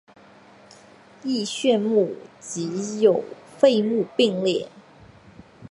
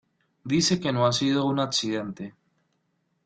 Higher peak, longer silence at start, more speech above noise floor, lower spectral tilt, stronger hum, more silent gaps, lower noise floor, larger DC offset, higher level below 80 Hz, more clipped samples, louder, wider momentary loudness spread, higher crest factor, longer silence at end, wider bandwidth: first, -2 dBFS vs -10 dBFS; first, 1.25 s vs 0.45 s; second, 29 dB vs 48 dB; about the same, -5 dB/octave vs -4.5 dB/octave; neither; neither; second, -50 dBFS vs -73 dBFS; neither; about the same, -66 dBFS vs -62 dBFS; neither; about the same, -22 LUFS vs -24 LUFS; about the same, 15 LU vs 17 LU; about the same, 22 dB vs 18 dB; second, 0.05 s vs 0.95 s; first, 11.5 kHz vs 9.4 kHz